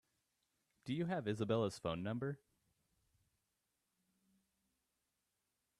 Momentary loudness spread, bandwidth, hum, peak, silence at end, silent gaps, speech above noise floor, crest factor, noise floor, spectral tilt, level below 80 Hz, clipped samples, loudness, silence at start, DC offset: 10 LU; 13 kHz; none; -24 dBFS; 3.45 s; none; 47 dB; 20 dB; -87 dBFS; -7 dB/octave; -76 dBFS; under 0.1%; -41 LUFS; 0.85 s; under 0.1%